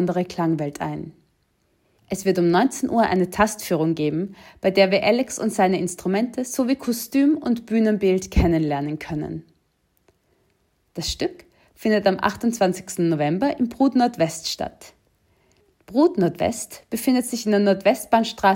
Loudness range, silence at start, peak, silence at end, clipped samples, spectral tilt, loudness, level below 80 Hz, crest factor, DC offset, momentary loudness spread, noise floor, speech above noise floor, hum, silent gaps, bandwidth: 5 LU; 0 s; -4 dBFS; 0 s; under 0.1%; -5.5 dB/octave; -22 LUFS; -42 dBFS; 18 dB; under 0.1%; 10 LU; -67 dBFS; 46 dB; none; none; 16.5 kHz